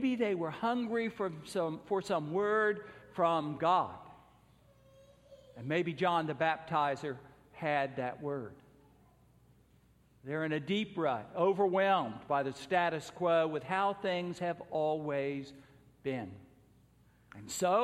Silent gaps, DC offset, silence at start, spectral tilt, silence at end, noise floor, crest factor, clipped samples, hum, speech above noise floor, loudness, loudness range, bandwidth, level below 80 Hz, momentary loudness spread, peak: none; under 0.1%; 0 s; -5.5 dB/octave; 0 s; -66 dBFS; 18 dB; under 0.1%; none; 33 dB; -34 LUFS; 7 LU; 15 kHz; -72 dBFS; 12 LU; -16 dBFS